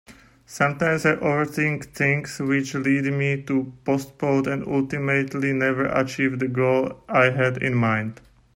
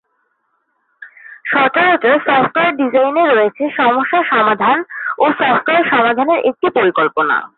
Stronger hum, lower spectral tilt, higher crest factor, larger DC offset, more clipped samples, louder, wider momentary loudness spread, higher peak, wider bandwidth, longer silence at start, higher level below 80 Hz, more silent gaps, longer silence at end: neither; second, -6.5 dB/octave vs -9.5 dB/octave; first, 18 dB vs 12 dB; neither; neither; second, -22 LUFS vs -13 LUFS; about the same, 5 LU vs 4 LU; about the same, -4 dBFS vs -2 dBFS; first, 16 kHz vs 4.3 kHz; second, 0.1 s vs 1 s; first, -56 dBFS vs -62 dBFS; neither; first, 0.4 s vs 0.1 s